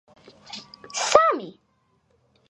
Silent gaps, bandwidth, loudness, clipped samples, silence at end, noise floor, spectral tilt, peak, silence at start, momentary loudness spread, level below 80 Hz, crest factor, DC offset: none; 11.5 kHz; -21 LUFS; under 0.1%; 1 s; -67 dBFS; -1.5 dB/octave; 0 dBFS; 0.5 s; 22 LU; -62 dBFS; 26 dB; under 0.1%